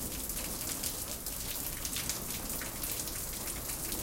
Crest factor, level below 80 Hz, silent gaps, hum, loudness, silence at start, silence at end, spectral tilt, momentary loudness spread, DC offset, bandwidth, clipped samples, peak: 22 dB; -48 dBFS; none; none; -35 LUFS; 0 s; 0 s; -2 dB/octave; 2 LU; under 0.1%; 17 kHz; under 0.1%; -16 dBFS